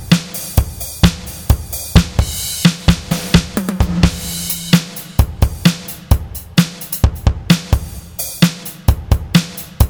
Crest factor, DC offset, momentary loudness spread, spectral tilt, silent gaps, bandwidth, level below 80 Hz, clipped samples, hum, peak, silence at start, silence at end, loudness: 16 dB; under 0.1%; 6 LU; -5 dB/octave; none; over 20 kHz; -20 dBFS; under 0.1%; none; 0 dBFS; 0 s; 0 s; -16 LUFS